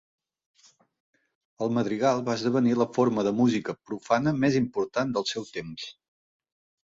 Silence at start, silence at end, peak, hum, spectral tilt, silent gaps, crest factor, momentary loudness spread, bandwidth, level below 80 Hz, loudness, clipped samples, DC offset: 1.6 s; 0.95 s; -10 dBFS; none; -6 dB/octave; none; 18 dB; 12 LU; 7.8 kHz; -64 dBFS; -26 LUFS; under 0.1%; under 0.1%